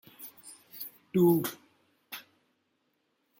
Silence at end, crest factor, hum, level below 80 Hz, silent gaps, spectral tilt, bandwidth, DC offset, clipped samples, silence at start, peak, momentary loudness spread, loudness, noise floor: 1.2 s; 20 dB; none; -76 dBFS; none; -6.5 dB/octave; 17 kHz; under 0.1%; under 0.1%; 0.2 s; -14 dBFS; 23 LU; -27 LUFS; -76 dBFS